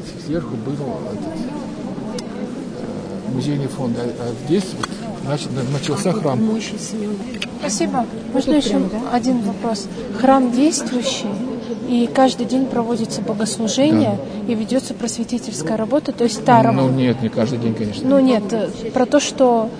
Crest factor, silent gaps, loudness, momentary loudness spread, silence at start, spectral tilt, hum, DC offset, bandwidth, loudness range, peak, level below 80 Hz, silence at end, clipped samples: 18 dB; none; -19 LUFS; 12 LU; 0 s; -5.5 dB/octave; none; under 0.1%; 10.5 kHz; 7 LU; 0 dBFS; -48 dBFS; 0 s; under 0.1%